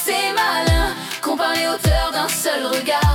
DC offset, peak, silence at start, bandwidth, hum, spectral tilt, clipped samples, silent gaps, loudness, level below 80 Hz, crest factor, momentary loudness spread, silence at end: under 0.1%; -6 dBFS; 0 s; 18 kHz; none; -3.5 dB/octave; under 0.1%; none; -19 LUFS; -28 dBFS; 14 dB; 4 LU; 0 s